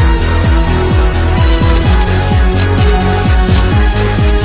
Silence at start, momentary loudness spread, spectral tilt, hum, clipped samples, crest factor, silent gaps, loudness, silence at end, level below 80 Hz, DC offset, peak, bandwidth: 0 s; 1 LU; -11 dB/octave; none; under 0.1%; 8 dB; none; -11 LUFS; 0 s; -12 dBFS; under 0.1%; 0 dBFS; 4 kHz